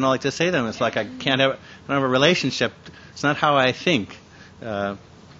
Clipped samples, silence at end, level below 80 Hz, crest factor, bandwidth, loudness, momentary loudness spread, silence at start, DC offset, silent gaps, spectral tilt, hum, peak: under 0.1%; 0.4 s; -58 dBFS; 22 dB; 8 kHz; -21 LUFS; 15 LU; 0 s; under 0.1%; none; -4.5 dB/octave; none; 0 dBFS